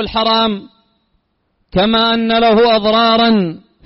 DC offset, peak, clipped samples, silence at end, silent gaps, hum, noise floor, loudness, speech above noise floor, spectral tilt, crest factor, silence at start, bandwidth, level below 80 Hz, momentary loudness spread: under 0.1%; -4 dBFS; under 0.1%; 0.3 s; none; none; -64 dBFS; -12 LUFS; 52 dB; -2.5 dB/octave; 10 dB; 0 s; 5.8 kHz; -42 dBFS; 9 LU